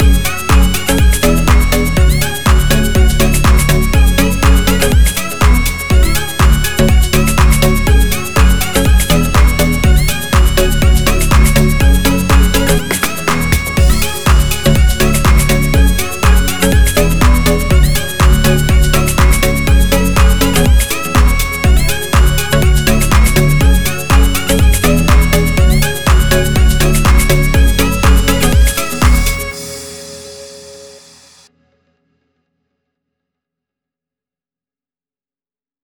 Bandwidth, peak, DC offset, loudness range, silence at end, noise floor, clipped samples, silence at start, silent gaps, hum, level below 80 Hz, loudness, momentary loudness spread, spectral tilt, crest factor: over 20 kHz; 0 dBFS; 6%; 1 LU; 0 s; under -90 dBFS; under 0.1%; 0 s; none; none; -12 dBFS; -11 LUFS; 3 LU; -4.5 dB/octave; 10 dB